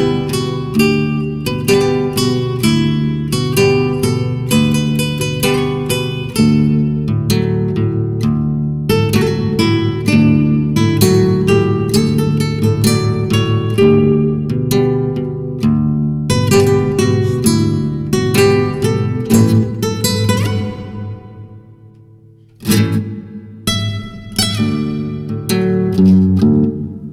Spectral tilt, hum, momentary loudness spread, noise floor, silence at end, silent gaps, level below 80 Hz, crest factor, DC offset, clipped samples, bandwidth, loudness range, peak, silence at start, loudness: -6 dB/octave; none; 8 LU; -43 dBFS; 0 s; none; -36 dBFS; 12 dB; under 0.1%; under 0.1%; 16 kHz; 5 LU; -2 dBFS; 0 s; -14 LUFS